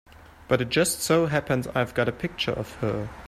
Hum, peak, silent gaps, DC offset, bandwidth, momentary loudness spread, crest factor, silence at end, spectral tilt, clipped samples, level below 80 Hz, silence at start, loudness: none; -6 dBFS; none; under 0.1%; 15 kHz; 7 LU; 20 dB; 0 s; -4.5 dB/octave; under 0.1%; -50 dBFS; 0.15 s; -25 LUFS